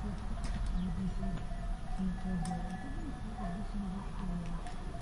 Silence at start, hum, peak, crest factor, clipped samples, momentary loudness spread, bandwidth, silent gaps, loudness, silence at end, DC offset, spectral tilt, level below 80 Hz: 0 s; none; -24 dBFS; 12 dB; under 0.1%; 6 LU; 11 kHz; none; -40 LUFS; 0 s; under 0.1%; -7 dB/octave; -40 dBFS